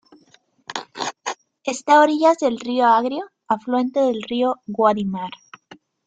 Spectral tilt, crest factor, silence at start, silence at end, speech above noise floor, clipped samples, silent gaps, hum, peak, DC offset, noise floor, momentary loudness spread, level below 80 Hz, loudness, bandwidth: -4.5 dB/octave; 18 dB; 0.7 s; 0.75 s; 39 dB; under 0.1%; none; none; -2 dBFS; under 0.1%; -57 dBFS; 16 LU; -66 dBFS; -20 LUFS; 9.4 kHz